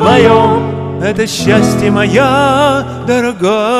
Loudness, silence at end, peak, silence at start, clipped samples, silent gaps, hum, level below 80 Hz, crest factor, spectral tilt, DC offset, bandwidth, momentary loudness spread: -10 LUFS; 0 s; 0 dBFS; 0 s; 0.4%; none; none; -38 dBFS; 10 dB; -5.5 dB/octave; under 0.1%; 14.5 kHz; 8 LU